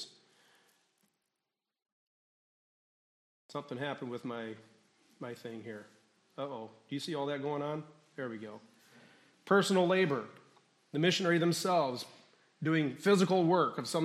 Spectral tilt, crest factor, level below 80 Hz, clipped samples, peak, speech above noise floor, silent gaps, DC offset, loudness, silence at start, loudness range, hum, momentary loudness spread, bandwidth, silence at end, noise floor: -5 dB/octave; 20 dB; -84 dBFS; under 0.1%; -14 dBFS; 57 dB; 1.92-3.49 s; under 0.1%; -32 LUFS; 0 s; 13 LU; none; 20 LU; 14 kHz; 0 s; -89 dBFS